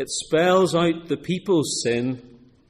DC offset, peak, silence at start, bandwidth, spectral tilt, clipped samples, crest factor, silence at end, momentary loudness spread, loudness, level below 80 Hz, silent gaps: under 0.1%; -8 dBFS; 0 s; 14.5 kHz; -4.5 dB/octave; under 0.1%; 14 dB; 0.5 s; 10 LU; -22 LUFS; -58 dBFS; none